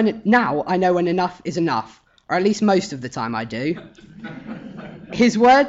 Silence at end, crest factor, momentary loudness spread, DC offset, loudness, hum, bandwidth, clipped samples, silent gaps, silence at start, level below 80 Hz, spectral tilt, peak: 0 s; 14 dB; 19 LU; under 0.1%; -20 LUFS; none; 8 kHz; under 0.1%; none; 0 s; -54 dBFS; -5.5 dB/octave; -6 dBFS